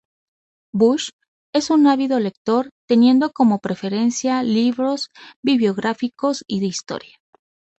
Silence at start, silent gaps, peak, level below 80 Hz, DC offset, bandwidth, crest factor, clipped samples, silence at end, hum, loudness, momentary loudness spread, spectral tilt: 0.75 s; 1.13-1.19 s, 1.28-1.53 s, 2.37-2.45 s, 2.72-2.88 s, 5.36-5.43 s; -4 dBFS; -64 dBFS; under 0.1%; 8.2 kHz; 16 dB; under 0.1%; 0.8 s; none; -19 LUFS; 11 LU; -5 dB/octave